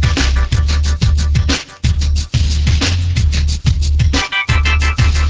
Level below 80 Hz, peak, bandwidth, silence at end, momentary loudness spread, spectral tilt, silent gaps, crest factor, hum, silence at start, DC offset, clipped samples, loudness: -14 dBFS; 0 dBFS; 8 kHz; 0 s; 3 LU; -4.5 dB/octave; none; 12 dB; none; 0 s; under 0.1%; under 0.1%; -15 LUFS